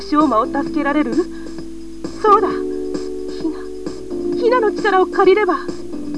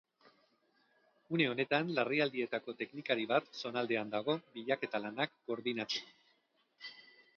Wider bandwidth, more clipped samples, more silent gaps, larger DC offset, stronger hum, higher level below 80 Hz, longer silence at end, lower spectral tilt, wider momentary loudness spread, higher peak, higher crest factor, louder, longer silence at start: first, 11 kHz vs 6.8 kHz; neither; neither; first, 2% vs under 0.1%; neither; first, -44 dBFS vs -86 dBFS; second, 0 s vs 0.35 s; first, -5.5 dB/octave vs -3 dB/octave; first, 16 LU vs 9 LU; first, 0 dBFS vs -18 dBFS; about the same, 16 dB vs 20 dB; first, -17 LUFS vs -36 LUFS; second, 0 s vs 1.3 s